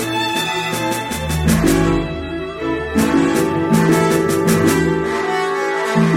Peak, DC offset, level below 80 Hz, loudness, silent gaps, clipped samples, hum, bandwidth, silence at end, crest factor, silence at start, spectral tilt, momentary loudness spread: -2 dBFS; under 0.1%; -32 dBFS; -17 LUFS; none; under 0.1%; none; 16.5 kHz; 0 s; 14 dB; 0 s; -5 dB/octave; 7 LU